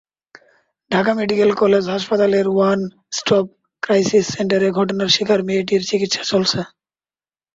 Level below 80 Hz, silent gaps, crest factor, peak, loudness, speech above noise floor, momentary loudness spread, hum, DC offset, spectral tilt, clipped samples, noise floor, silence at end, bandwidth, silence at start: -58 dBFS; none; 16 dB; -2 dBFS; -17 LUFS; over 73 dB; 7 LU; none; under 0.1%; -4.5 dB/octave; under 0.1%; under -90 dBFS; 0.9 s; 7.8 kHz; 0.9 s